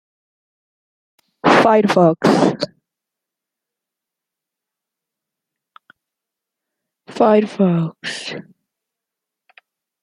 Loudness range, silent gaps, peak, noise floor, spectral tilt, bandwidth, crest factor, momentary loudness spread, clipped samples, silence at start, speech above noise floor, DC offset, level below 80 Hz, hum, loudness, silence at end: 6 LU; none; 0 dBFS; -84 dBFS; -6.5 dB/octave; 12.5 kHz; 20 dB; 15 LU; under 0.1%; 1.45 s; 69 dB; under 0.1%; -64 dBFS; none; -15 LUFS; 1.6 s